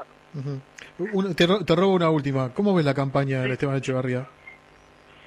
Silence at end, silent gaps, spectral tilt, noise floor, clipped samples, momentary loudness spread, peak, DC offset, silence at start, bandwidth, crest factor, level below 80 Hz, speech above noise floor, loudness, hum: 0.75 s; none; -7 dB/octave; -53 dBFS; under 0.1%; 15 LU; -6 dBFS; under 0.1%; 0 s; 12.5 kHz; 18 dB; -56 dBFS; 29 dB; -23 LUFS; none